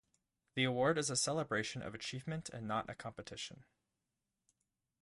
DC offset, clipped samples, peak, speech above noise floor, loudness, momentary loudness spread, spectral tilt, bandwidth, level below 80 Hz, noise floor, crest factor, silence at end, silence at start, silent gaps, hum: under 0.1%; under 0.1%; -20 dBFS; 50 dB; -39 LUFS; 14 LU; -3.5 dB/octave; 11.5 kHz; -70 dBFS; -89 dBFS; 22 dB; 1.4 s; 0.55 s; none; none